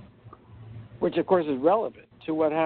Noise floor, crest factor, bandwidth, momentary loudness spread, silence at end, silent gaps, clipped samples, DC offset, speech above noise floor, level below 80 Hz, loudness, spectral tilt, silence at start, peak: -50 dBFS; 18 dB; 4.5 kHz; 21 LU; 0 s; none; under 0.1%; under 0.1%; 26 dB; -62 dBFS; -26 LUFS; -5.5 dB/octave; 0 s; -8 dBFS